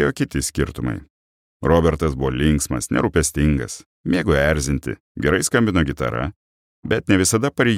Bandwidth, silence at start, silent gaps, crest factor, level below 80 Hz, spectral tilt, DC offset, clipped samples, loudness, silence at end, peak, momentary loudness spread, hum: 16 kHz; 0 s; 1.10-1.60 s, 3.86-4.04 s, 5.00-5.15 s, 6.36-6.83 s; 18 dB; -32 dBFS; -5 dB/octave; under 0.1%; under 0.1%; -20 LUFS; 0 s; -2 dBFS; 10 LU; none